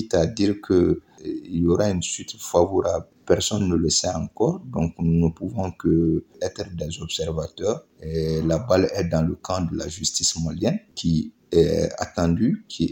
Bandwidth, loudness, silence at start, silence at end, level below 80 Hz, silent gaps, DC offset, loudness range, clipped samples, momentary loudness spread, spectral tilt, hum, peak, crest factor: 17 kHz; -23 LUFS; 0 s; 0 s; -42 dBFS; none; under 0.1%; 3 LU; under 0.1%; 9 LU; -5 dB/octave; none; -4 dBFS; 20 dB